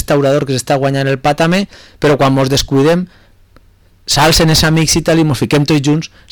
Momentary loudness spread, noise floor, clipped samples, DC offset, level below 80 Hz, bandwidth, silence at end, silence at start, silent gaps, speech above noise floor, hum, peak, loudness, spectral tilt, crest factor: 7 LU; -46 dBFS; under 0.1%; under 0.1%; -32 dBFS; 19 kHz; 0.25 s; 0 s; none; 35 dB; none; -4 dBFS; -12 LUFS; -4.5 dB/octave; 10 dB